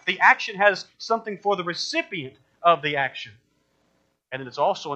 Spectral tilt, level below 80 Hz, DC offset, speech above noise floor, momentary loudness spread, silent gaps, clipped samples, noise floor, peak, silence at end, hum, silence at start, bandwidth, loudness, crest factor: -3.5 dB/octave; -76 dBFS; under 0.1%; 45 dB; 18 LU; none; under 0.1%; -69 dBFS; -2 dBFS; 0 s; none; 0.05 s; 8.6 kHz; -23 LUFS; 22 dB